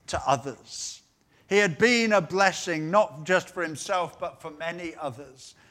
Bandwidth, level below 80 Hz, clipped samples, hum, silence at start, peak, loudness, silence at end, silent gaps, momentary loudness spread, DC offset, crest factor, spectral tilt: 15.5 kHz; -60 dBFS; under 0.1%; none; 0.1 s; -6 dBFS; -25 LUFS; 0.2 s; none; 16 LU; under 0.1%; 22 dB; -3.5 dB/octave